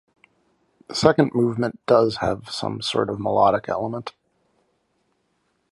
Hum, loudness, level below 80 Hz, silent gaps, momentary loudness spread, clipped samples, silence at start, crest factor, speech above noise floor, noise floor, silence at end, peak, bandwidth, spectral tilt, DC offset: none; -21 LUFS; -54 dBFS; none; 11 LU; under 0.1%; 0.9 s; 22 dB; 49 dB; -70 dBFS; 1.6 s; 0 dBFS; 11.5 kHz; -5.5 dB/octave; under 0.1%